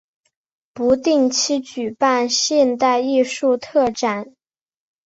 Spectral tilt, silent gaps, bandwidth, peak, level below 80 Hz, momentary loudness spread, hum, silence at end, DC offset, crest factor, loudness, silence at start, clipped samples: -2.5 dB/octave; none; 8.2 kHz; -2 dBFS; -58 dBFS; 7 LU; none; 0.8 s; under 0.1%; 16 dB; -18 LUFS; 0.75 s; under 0.1%